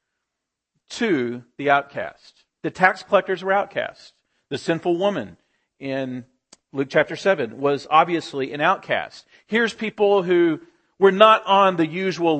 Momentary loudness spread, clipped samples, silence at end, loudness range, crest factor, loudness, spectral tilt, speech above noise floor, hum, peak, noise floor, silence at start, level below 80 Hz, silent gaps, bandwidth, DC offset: 15 LU; under 0.1%; 0 s; 7 LU; 22 dB; -20 LUFS; -5.5 dB/octave; 62 dB; none; 0 dBFS; -82 dBFS; 0.9 s; -68 dBFS; none; 8.8 kHz; under 0.1%